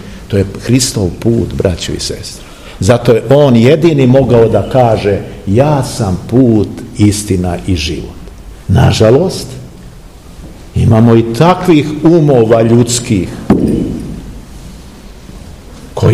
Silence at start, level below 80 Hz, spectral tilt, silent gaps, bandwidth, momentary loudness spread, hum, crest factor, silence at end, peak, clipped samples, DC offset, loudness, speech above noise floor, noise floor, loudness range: 0 s; -30 dBFS; -6.5 dB/octave; none; 15 kHz; 15 LU; none; 10 dB; 0 s; 0 dBFS; 2%; 0.6%; -10 LUFS; 23 dB; -32 dBFS; 5 LU